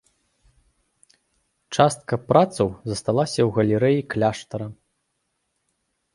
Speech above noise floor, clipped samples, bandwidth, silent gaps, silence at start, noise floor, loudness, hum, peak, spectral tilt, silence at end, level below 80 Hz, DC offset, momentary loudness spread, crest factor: 54 dB; under 0.1%; 11.5 kHz; none; 1.7 s; -75 dBFS; -22 LUFS; none; 0 dBFS; -6 dB/octave; 1.4 s; -54 dBFS; under 0.1%; 12 LU; 22 dB